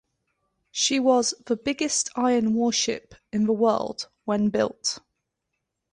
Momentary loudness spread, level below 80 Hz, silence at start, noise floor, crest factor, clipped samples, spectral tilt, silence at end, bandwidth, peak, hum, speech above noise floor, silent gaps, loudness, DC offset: 11 LU; -62 dBFS; 0.75 s; -81 dBFS; 18 dB; under 0.1%; -3 dB/octave; 0.95 s; 11 kHz; -8 dBFS; none; 57 dB; none; -24 LUFS; under 0.1%